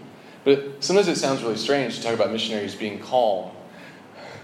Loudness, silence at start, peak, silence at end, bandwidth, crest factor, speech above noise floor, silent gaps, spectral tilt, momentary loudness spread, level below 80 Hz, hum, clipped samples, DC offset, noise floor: -23 LUFS; 0 s; -4 dBFS; 0 s; 13.5 kHz; 20 dB; 21 dB; none; -4 dB/octave; 22 LU; -74 dBFS; none; under 0.1%; under 0.1%; -44 dBFS